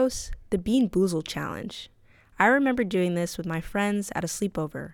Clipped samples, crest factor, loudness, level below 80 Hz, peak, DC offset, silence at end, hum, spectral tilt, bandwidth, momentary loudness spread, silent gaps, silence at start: under 0.1%; 22 dB; -26 LUFS; -48 dBFS; -6 dBFS; under 0.1%; 0 s; none; -5 dB/octave; 18.5 kHz; 13 LU; none; 0 s